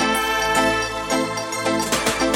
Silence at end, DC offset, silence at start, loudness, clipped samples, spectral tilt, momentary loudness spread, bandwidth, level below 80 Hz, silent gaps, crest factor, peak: 0 s; under 0.1%; 0 s; -20 LUFS; under 0.1%; -2.5 dB/octave; 5 LU; 17 kHz; -42 dBFS; none; 16 dB; -6 dBFS